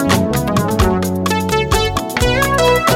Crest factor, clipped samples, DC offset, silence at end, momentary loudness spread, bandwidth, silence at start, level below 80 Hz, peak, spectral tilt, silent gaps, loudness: 14 dB; under 0.1%; 0.4%; 0 s; 4 LU; 17 kHz; 0 s; -26 dBFS; 0 dBFS; -5 dB/octave; none; -15 LUFS